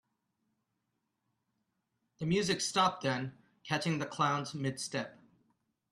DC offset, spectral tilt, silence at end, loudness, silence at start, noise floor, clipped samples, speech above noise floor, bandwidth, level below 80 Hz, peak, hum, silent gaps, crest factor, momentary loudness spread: under 0.1%; -4 dB/octave; 0.8 s; -33 LUFS; 2.2 s; -83 dBFS; under 0.1%; 50 dB; 13.5 kHz; -70 dBFS; -14 dBFS; none; none; 22 dB; 11 LU